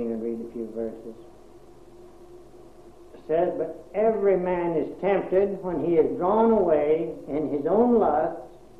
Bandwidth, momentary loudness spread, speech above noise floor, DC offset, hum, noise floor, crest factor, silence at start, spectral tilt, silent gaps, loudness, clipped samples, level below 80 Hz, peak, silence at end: 4.5 kHz; 13 LU; 26 dB; 0.2%; none; -50 dBFS; 16 dB; 0 s; -9 dB/octave; none; -24 LUFS; under 0.1%; -52 dBFS; -8 dBFS; 0.3 s